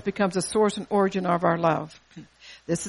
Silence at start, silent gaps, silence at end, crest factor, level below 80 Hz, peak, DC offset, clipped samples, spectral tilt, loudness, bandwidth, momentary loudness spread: 0.05 s; none; 0 s; 18 dB; -60 dBFS; -8 dBFS; under 0.1%; under 0.1%; -5.5 dB/octave; -24 LUFS; 11.5 kHz; 8 LU